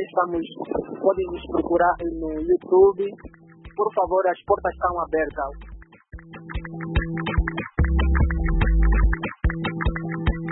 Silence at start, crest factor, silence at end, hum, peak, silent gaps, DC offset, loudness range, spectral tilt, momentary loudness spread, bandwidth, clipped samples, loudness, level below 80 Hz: 0 s; 16 dB; 0 s; none; -6 dBFS; none; under 0.1%; 5 LU; -12 dB/octave; 12 LU; 4.1 kHz; under 0.1%; -23 LUFS; -26 dBFS